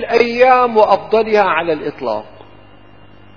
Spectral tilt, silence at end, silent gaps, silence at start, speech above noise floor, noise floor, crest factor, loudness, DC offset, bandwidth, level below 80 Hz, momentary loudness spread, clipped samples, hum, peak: -5.5 dB/octave; 1.15 s; none; 0 s; 30 dB; -43 dBFS; 14 dB; -14 LUFS; 0.7%; 5.4 kHz; -54 dBFS; 12 LU; under 0.1%; none; 0 dBFS